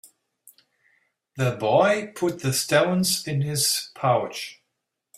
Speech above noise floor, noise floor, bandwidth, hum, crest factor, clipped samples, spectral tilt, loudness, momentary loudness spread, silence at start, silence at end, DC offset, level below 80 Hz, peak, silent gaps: 57 dB; -80 dBFS; 16 kHz; none; 20 dB; under 0.1%; -4 dB/octave; -23 LUFS; 11 LU; 1.35 s; 0.65 s; under 0.1%; -64 dBFS; -4 dBFS; none